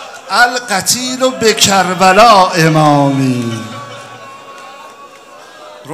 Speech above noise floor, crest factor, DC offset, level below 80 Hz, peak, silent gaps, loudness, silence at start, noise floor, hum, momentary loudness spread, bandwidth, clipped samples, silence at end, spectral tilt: 26 dB; 12 dB; under 0.1%; -48 dBFS; 0 dBFS; none; -10 LUFS; 0 s; -36 dBFS; none; 25 LU; over 20 kHz; 0.6%; 0 s; -3.5 dB/octave